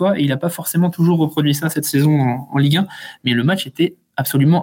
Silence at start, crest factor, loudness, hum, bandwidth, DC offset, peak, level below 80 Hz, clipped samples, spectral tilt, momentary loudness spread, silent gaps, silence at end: 0 s; 12 dB; -17 LUFS; none; 17 kHz; under 0.1%; -4 dBFS; -62 dBFS; under 0.1%; -6 dB/octave; 5 LU; none; 0 s